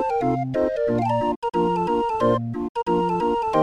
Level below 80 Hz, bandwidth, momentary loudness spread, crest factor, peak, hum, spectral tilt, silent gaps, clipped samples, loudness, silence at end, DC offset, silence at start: -48 dBFS; 10.5 kHz; 3 LU; 14 dB; -8 dBFS; none; -8 dB/octave; 1.36-1.42 s, 2.69-2.75 s; under 0.1%; -23 LUFS; 0 s; under 0.1%; 0 s